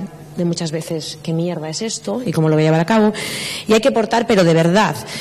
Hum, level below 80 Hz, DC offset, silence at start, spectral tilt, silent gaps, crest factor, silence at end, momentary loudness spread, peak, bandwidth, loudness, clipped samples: none; -52 dBFS; under 0.1%; 0 s; -5.5 dB/octave; none; 14 dB; 0 s; 10 LU; -4 dBFS; 14 kHz; -17 LUFS; under 0.1%